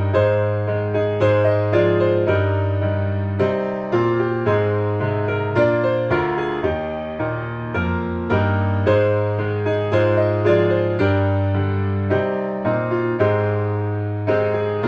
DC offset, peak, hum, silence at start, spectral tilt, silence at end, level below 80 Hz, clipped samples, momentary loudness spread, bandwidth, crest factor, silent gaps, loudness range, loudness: under 0.1%; -4 dBFS; none; 0 s; -9.5 dB/octave; 0 s; -46 dBFS; under 0.1%; 6 LU; 5.6 kHz; 16 dB; none; 3 LU; -20 LUFS